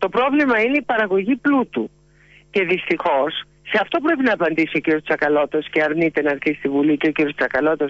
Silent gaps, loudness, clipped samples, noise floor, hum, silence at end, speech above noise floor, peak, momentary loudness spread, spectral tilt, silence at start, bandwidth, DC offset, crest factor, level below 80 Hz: none; -19 LUFS; under 0.1%; -51 dBFS; none; 0 s; 32 dB; -8 dBFS; 5 LU; -7 dB/octave; 0 s; 7.4 kHz; under 0.1%; 12 dB; -56 dBFS